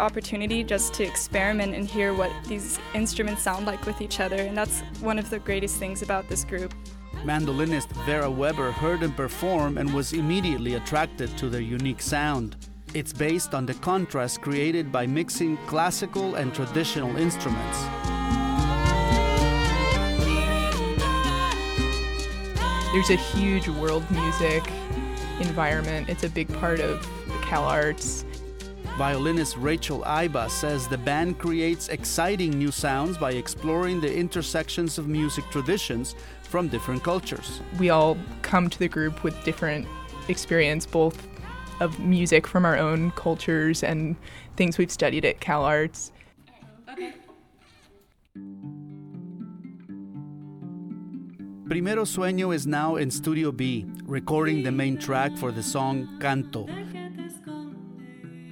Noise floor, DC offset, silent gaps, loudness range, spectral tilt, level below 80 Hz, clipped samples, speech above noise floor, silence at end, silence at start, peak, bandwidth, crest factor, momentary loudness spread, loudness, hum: -59 dBFS; under 0.1%; none; 5 LU; -5 dB/octave; -36 dBFS; under 0.1%; 33 dB; 0 s; 0 s; -6 dBFS; 18.5 kHz; 20 dB; 15 LU; -26 LUFS; none